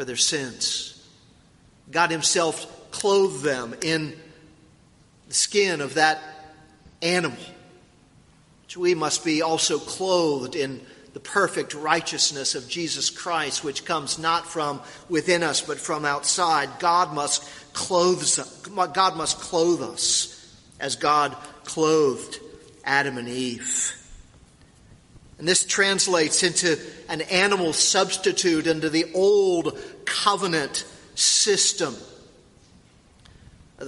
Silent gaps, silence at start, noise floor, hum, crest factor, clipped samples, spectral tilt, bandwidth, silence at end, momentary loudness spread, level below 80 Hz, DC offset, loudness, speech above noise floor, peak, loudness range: none; 0 s; -56 dBFS; none; 22 dB; under 0.1%; -2 dB/octave; 11.5 kHz; 0 s; 12 LU; -60 dBFS; under 0.1%; -22 LUFS; 32 dB; -2 dBFS; 4 LU